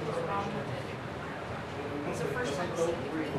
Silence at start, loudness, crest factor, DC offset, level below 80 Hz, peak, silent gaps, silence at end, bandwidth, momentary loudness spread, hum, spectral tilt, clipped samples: 0 s; -35 LUFS; 16 dB; under 0.1%; -54 dBFS; -18 dBFS; none; 0 s; 13 kHz; 7 LU; none; -5.5 dB/octave; under 0.1%